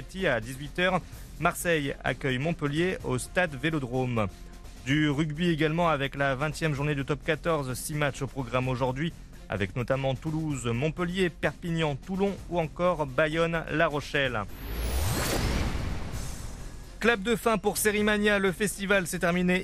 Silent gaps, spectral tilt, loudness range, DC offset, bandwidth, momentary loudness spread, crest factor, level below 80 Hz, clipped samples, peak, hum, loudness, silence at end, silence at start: none; -5 dB/octave; 3 LU; under 0.1%; 14.5 kHz; 9 LU; 20 dB; -42 dBFS; under 0.1%; -8 dBFS; none; -28 LUFS; 0 s; 0 s